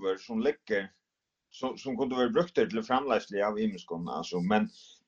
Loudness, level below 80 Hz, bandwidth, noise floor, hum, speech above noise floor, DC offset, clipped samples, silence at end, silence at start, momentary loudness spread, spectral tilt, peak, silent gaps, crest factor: -31 LUFS; -66 dBFS; 7.6 kHz; -77 dBFS; none; 46 dB; under 0.1%; under 0.1%; 0.25 s; 0 s; 9 LU; -6 dB/octave; -12 dBFS; none; 20 dB